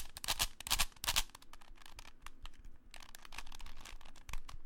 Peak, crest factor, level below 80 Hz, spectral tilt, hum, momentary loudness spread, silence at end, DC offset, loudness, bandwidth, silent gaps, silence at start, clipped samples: -14 dBFS; 28 dB; -48 dBFS; 0 dB/octave; none; 22 LU; 0 s; under 0.1%; -38 LUFS; 17 kHz; none; 0 s; under 0.1%